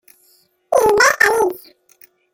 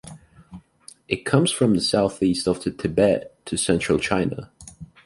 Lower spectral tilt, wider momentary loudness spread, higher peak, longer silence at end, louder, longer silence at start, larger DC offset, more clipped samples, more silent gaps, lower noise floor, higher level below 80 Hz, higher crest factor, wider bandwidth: second, -1.5 dB/octave vs -5 dB/octave; about the same, 9 LU vs 11 LU; about the same, 0 dBFS vs -2 dBFS; first, 0.75 s vs 0.2 s; first, -14 LUFS vs -22 LUFS; first, 0.7 s vs 0.05 s; neither; neither; neither; first, -57 dBFS vs -50 dBFS; about the same, -52 dBFS vs -48 dBFS; about the same, 18 dB vs 20 dB; first, 17 kHz vs 11.5 kHz